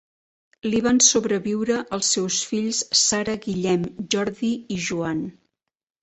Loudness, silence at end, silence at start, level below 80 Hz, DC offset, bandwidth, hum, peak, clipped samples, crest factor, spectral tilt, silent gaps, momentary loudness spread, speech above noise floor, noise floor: -21 LUFS; 0.7 s; 0.65 s; -56 dBFS; under 0.1%; 8.4 kHz; none; -2 dBFS; under 0.1%; 22 dB; -2.5 dB/octave; none; 11 LU; 62 dB; -85 dBFS